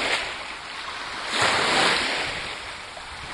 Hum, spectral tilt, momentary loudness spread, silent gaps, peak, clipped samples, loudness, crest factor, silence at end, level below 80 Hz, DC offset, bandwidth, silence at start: none; -1.5 dB/octave; 15 LU; none; -6 dBFS; under 0.1%; -24 LUFS; 20 dB; 0 s; -52 dBFS; under 0.1%; 11.5 kHz; 0 s